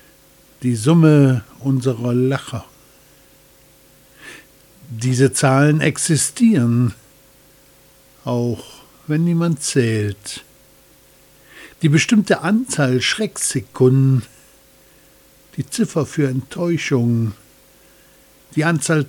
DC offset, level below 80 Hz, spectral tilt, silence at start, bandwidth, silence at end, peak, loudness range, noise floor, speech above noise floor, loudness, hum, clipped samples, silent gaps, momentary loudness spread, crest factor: under 0.1%; -56 dBFS; -5.5 dB/octave; 0.6 s; 19 kHz; 0 s; -2 dBFS; 5 LU; -50 dBFS; 34 dB; -17 LUFS; none; under 0.1%; none; 16 LU; 18 dB